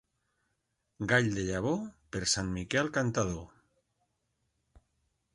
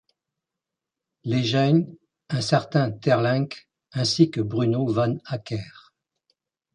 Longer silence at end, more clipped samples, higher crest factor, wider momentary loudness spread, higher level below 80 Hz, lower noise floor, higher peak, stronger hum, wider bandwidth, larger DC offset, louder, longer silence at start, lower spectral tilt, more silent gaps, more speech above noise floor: first, 1.9 s vs 0.95 s; neither; about the same, 22 dB vs 20 dB; second, 10 LU vs 13 LU; first, -54 dBFS vs -60 dBFS; second, -81 dBFS vs -87 dBFS; second, -12 dBFS vs -4 dBFS; neither; about the same, 11.5 kHz vs 10.5 kHz; neither; second, -31 LUFS vs -23 LUFS; second, 1 s vs 1.25 s; second, -4 dB/octave vs -6.5 dB/octave; neither; second, 50 dB vs 64 dB